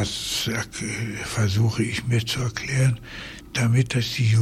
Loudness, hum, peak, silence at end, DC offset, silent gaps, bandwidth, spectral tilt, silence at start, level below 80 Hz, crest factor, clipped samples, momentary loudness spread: -24 LUFS; none; -8 dBFS; 0 s; under 0.1%; none; 15 kHz; -4.5 dB/octave; 0 s; -46 dBFS; 16 dB; under 0.1%; 8 LU